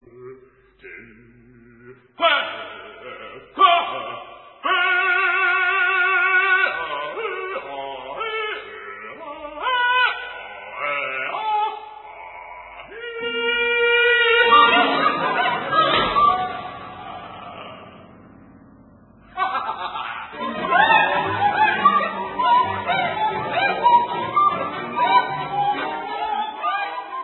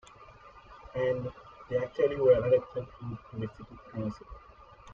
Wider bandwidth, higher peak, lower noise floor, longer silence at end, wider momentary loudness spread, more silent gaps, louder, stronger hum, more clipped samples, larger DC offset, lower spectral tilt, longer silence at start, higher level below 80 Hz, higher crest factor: second, 4.3 kHz vs 7 kHz; first, -2 dBFS vs -12 dBFS; about the same, -51 dBFS vs -53 dBFS; about the same, 0 s vs 0 s; second, 20 LU vs 26 LU; neither; first, -19 LUFS vs -31 LUFS; neither; neither; neither; about the same, -8 dB/octave vs -8 dB/octave; about the same, 0.15 s vs 0.2 s; about the same, -56 dBFS vs -56 dBFS; about the same, 20 dB vs 20 dB